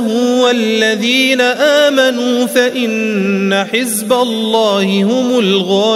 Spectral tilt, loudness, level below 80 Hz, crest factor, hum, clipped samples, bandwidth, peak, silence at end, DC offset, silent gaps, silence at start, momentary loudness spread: -4 dB/octave; -12 LUFS; -64 dBFS; 12 dB; none; under 0.1%; 16 kHz; 0 dBFS; 0 s; under 0.1%; none; 0 s; 4 LU